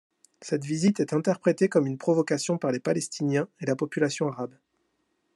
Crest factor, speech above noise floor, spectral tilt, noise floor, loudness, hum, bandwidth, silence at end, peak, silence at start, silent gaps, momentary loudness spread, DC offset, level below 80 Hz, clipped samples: 18 dB; 48 dB; -5.5 dB/octave; -74 dBFS; -26 LUFS; none; 12 kHz; 0.85 s; -8 dBFS; 0.4 s; none; 7 LU; under 0.1%; -74 dBFS; under 0.1%